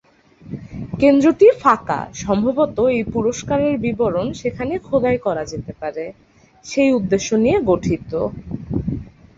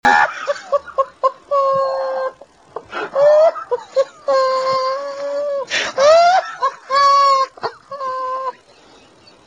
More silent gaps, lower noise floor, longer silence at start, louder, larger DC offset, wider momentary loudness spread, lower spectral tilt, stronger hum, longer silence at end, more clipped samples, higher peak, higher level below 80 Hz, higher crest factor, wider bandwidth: neither; second, -42 dBFS vs -47 dBFS; first, 0.45 s vs 0.05 s; about the same, -18 LUFS vs -16 LUFS; neither; about the same, 16 LU vs 15 LU; first, -6.5 dB/octave vs -2 dB/octave; neither; second, 0.3 s vs 0.95 s; neither; about the same, -2 dBFS vs 0 dBFS; first, -42 dBFS vs -58 dBFS; about the same, 18 dB vs 16 dB; second, 7.8 kHz vs 9.6 kHz